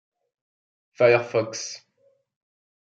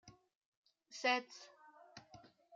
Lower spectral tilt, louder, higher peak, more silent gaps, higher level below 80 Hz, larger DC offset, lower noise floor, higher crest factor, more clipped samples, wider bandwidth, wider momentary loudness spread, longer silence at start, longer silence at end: first, -4.5 dB/octave vs -2 dB/octave; first, -22 LUFS vs -38 LUFS; first, -6 dBFS vs -20 dBFS; second, none vs 0.35-0.64 s; first, -76 dBFS vs -86 dBFS; neither; about the same, -66 dBFS vs -63 dBFS; about the same, 22 dB vs 24 dB; neither; second, 8 kHz vs 9.2 kHz; second, 16 LU vs 24 LU; first, 1 s vs 0.05 s; first, 1.05 s vs 0.35 s